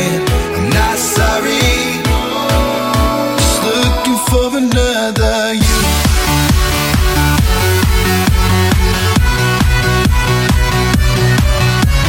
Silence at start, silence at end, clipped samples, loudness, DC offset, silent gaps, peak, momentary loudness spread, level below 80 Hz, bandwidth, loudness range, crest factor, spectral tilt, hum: 0 s; 0 s; under 0.1%; -12 LUFS; under 0.1%; none; 0 dBFS; 2 LU; -16 dBFS; 17 kHz; 1 LU; 12 dB; -4.5 dB/octave; none